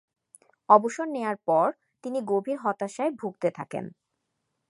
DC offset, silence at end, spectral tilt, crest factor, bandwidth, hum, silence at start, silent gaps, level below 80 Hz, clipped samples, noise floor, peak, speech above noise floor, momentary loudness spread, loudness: under 0.1%; 0.8 s; -6 dB/octave; 24 dB; 11.5 kHz; none; 0.7 s; none; -82 dBFS; under 0.1%; -80 dBFS; -4 dBFS; 54 dB; 16 LU; -26 LUFS